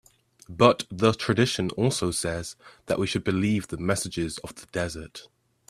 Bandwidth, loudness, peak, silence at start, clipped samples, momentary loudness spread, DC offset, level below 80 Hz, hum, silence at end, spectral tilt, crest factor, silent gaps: 15 kHz; -26 LUFS; 0 dBFS; 0.5 s; under 0.1%; 18 LU; under 0.1%; -54 dBFS; none; 0.5 s; -5 dB/octave; 26 dB; none